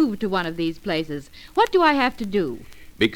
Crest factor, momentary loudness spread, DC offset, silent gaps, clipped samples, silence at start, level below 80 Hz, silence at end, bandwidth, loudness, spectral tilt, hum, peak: 18 dB; 13 LU; under 0.1%; none; under 0.1%; 0 s; -48 dBFS; 0 s; 17.5 kHz; -22 LUFS; -5.5 dB/octave; none; -4 dBFS